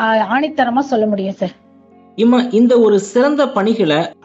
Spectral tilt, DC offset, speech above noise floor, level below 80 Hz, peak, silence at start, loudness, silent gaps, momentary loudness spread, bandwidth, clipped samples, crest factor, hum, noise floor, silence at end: -6 dB/octave; under 0.1%; 32 dB; -62 dBFS; -2 dBFS; 0 s; -14 LUFS; none; 9 LU; 8.2 kHz; under 0.1%; 12 dB; none; -45 dBFS; 0.1 s